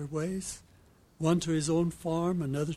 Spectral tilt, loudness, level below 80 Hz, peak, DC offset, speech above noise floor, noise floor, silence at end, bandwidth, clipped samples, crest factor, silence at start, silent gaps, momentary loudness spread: -6 dB/octave; -31 LUFS; -56 dBFS; -14 dBFS; under 0.1%; 30 dB; -60 dBFS; 0 s; 14 kHz; under 0.1%; 18 dB; 0 s; none; 9 LU